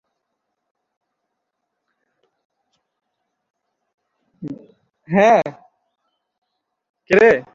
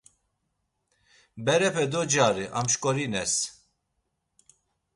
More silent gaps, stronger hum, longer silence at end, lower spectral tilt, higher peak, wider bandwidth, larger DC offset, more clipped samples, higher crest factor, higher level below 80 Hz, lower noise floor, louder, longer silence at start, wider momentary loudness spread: first, 6.38-6.42 s, 6.89-6.94 s vs none; neither; second, 0.15 s vs 1.45 s; first, -6.5 dB/octave vs -3 dB/octave; first, -2 dBFS vs -8 dBFS; second, 7.4 kHz vs 11.5 kHz; neither; neither; about the same, 22 dB vs 20 dB; about the same, -62 dBFS vs -62 dBFS; about the same, -77 dBFS vs -78 dBFS; first, -15 LUFS vs -25 LUFS; first, 4.4 s vs 1.35 s; first, 22 LU vs 5 LU